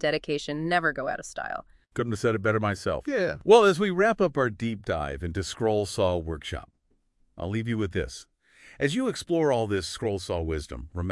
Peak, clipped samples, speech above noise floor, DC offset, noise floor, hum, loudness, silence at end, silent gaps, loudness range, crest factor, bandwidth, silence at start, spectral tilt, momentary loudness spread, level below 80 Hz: -4 dBFS; under 0.1%; 42 dB; under 0.1%; -68 dBFS; none; -26 LUFS; 0 s; none; 7 LU; 22 dB; 12 kHz; 0 s; -5.5 dB/octave; 12 LU; -48 dBFS